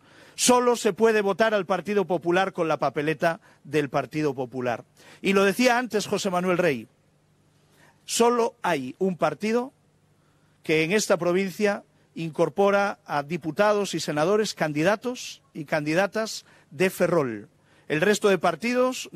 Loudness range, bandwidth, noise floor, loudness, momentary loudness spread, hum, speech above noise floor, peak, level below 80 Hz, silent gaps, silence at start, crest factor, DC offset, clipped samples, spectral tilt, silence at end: 2 LU; 15 kHz; -63 dBFS; -24 LUFS; 10 LU; none; 39 dB; -8 dBFS; -68 dBFS; none; 0.4 s; 18 dB; under 0.1%; under 0.1%; -4.5 dB/octave; 0.05 s